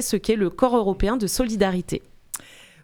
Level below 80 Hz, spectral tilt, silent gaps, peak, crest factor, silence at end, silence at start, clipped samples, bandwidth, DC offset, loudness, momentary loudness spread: -36 dBFS; -5 dB/octave; none; -4 dBFS; 20 dB; 0.45 s; 0 s; under 0.1%; 19.5 kHz; under 0.1%; -23 LUFS; 15 LU